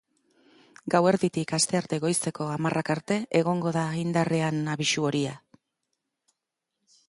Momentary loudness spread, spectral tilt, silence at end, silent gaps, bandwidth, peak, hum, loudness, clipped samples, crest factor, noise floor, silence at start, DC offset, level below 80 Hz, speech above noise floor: 5 LU; -4.5 dB/octave; 1.7 s; none; 11.5 kHz; -8 dBFS; none; -26 LUFS; under 0.1%; 20 dB; -84 dBFS; 0.85 s; under 0.1%; -68 dBFS; 58 dB